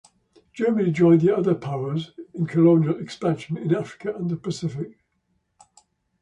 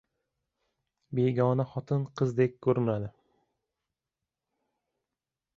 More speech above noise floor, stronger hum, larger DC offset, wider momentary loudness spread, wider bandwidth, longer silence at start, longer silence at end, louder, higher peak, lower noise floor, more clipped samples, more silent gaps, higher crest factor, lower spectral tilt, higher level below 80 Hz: second, 50 dB vs 62 dB; neither; neither; first, 13 LU vs 8 LU; first, 9.2 kHz vs 7.4 kHz; second, 0.55 s vs 1.1 s; second, 1.3 s vs 2.5 s; first, -22 LUFS vs -29 LUFS; first, -6 dBFS vs -12 dBFS; second, -72 dBFS vs -89 dBFS; neither; neither; about the same, 18 dB vs 20 dB; about the same, -8 dB/octave vs -9 dB/octave; about the same, -64 dBFS vs -66 dBFS